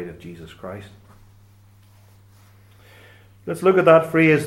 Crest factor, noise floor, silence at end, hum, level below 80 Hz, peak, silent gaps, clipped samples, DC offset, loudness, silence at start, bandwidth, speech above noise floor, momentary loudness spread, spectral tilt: 20 dB; -51 dBFS; 0 s; none; -58 dBFS; -2 dBFS; none; under 0.1%; under 0.1%; -16 LUFS; 0 s; 14 kHz; 32 dB; 25 LU; -7 dB/octave